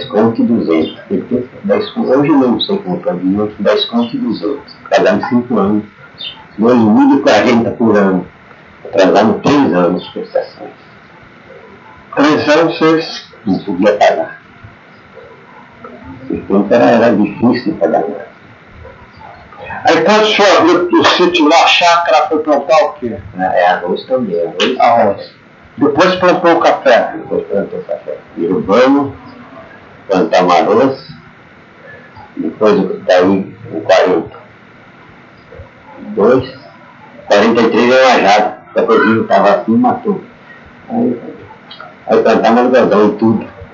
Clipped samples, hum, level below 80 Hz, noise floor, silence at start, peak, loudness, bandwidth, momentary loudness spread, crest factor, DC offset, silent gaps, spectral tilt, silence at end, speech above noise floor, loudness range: under 0.1%; none; -52 dBFS; -40 dBFS; 0 s; 0 dBFS; -11 LUFS; 7.6 kHz; 15 LU; 12 dB; under 0.1%; none; -5.5 dB/octave; 0.1 s; 29 dB; 5 LU